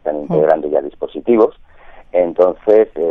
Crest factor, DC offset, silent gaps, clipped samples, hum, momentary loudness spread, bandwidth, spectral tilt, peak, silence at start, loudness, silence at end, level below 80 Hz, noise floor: 14 dB; under 0.1%; none; under 0.1%; none; 7 LU; 4.3 kHz; -9.5 dB/octave; 0 dBFS; 0.05 s; -15 LUFS; 0 s; -46 dBFS; -39 dBFS